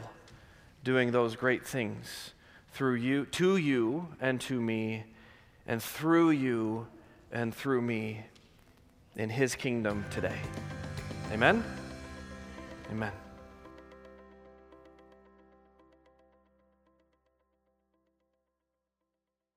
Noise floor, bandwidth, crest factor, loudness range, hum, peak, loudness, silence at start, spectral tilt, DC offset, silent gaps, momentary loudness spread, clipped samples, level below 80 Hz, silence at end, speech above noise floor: -87 dBFS; 16 kHz; 26 dB; 13 LU; none; -8 dBFS; -32 LUFS; 0 s; -5.5 dB/octave; under 0.1%; none; 22 LU; under 0.1%; -60 dBFS; 4.55 s; 57 dB